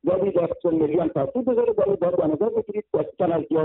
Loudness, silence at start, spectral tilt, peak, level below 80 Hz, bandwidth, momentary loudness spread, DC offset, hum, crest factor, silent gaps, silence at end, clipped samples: -23 LUFS; 0.05 s; -12.5 dB/octave; -10 dBFS; -56 dBFS; 4 kHz; 4 LU; under 0.1%; none; 12 dB; none; 0 s; under 0.1%